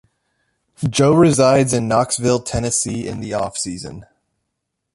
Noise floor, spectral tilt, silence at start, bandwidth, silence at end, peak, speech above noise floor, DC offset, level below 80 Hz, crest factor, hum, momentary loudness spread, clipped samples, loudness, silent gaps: -76 dBFS; -5 dB/octave; 0.8 s; 11.5 kHz; 0.9 s; -2 dBFS; 60 dB; under 0.1%; -44 dBFS; 16 dB; none; 13 LU; under 0.1%; -17 LUFS; none